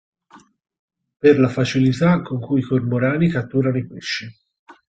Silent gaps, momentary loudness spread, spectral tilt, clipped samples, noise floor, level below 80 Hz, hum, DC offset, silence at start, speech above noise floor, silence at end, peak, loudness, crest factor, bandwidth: 0.79-0.88 s, 4.59-4.66 s; 10 LU; -7 dB/octave; under 0.1%; -51 dBFS; -54 dBFS; none; under 0.1%; 0.35 s; 32 dB; 0.2 s; -2 dBFS; -19 LUFS; 18 dB; 8 kHz